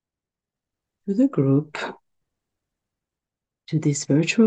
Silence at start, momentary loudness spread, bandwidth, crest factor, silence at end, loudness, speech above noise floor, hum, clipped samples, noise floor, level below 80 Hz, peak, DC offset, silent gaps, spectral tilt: 1.05 s; 12 LU; 9.2 kHz; 18 dB; 0 s; -22 LUFS; 69 dB; none; under 0.1%; -89 dBFS; -72 dBFS; -6 dBFS; under 0.1%; none; -6 dB/octave